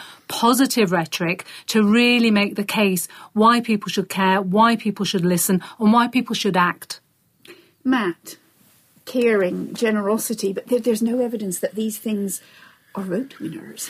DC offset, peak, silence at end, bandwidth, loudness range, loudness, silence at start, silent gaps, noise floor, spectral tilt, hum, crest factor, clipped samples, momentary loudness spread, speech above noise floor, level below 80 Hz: under 0.1%; -4 dBFS; 0 s; 15.5 kHz; 6 LU; -20 LUFS; 0 s; none; -56 dBFS; -4.5 dB/octave; none; 18 dB; under 0.1%; 12 LU; 37 dB; -66 dBFS